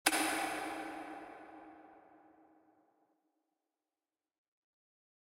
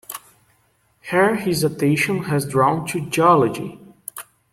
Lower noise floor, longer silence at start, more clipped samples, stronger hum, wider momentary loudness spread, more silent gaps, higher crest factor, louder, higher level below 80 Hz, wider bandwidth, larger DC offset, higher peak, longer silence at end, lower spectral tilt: first, under -90 dBFS vs -62 dBFS; about the same, 0.05 s vs 0.1 s; neither; neither; first, 24 LU vs 20 LU; neither; first, 32 dB vs 18 dB; second, -38 LUFS vs -19 LUFS; second, -80 dBFS vs -56 dBFS; about the same, 16 kHz vs 16.5 kHz; neither; second, -12 dBFS vs -4 dBFS; first, 3.15 s vs 0.3 s; second, -0.5 dB/octave vs -5.5 dB/octave